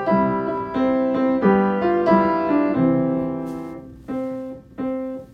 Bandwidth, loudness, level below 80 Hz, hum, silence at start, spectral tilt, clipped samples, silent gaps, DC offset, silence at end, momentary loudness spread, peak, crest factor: 5.8 kHz; -20 LUFS; -50 dBFS; none; 0 s; -9.5 dB/octave; under 0.1%; none; under 0.1%; 0.05 s; 14 LU; -4 dBFS; 16 dB